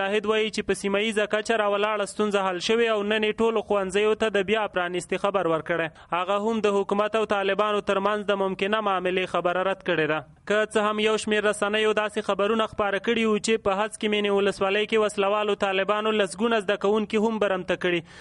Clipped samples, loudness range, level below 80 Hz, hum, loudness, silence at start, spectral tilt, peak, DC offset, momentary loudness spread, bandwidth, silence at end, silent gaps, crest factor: under 0.1%; 1 LU; -58 dBFS; none; -24 LUFS; 0 s; -4 dB/octave; -10 dBFS; under 0.1%; 3 LU; 11.5 kHz; 0 s; none; 14 dB